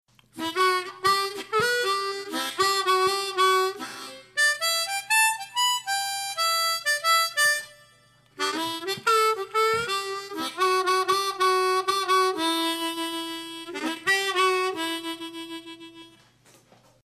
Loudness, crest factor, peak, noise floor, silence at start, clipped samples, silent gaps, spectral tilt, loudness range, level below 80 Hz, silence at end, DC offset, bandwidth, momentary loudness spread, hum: -24 LUFS; 16 dB; -10 dBFS; -58 dBFS; 0.35 s; under 0.1%; none; -0.5 dB/octave; 4 LU; -70 dBFS; 0.95 s; under 0.1%; 14 kHz; 12 LU; none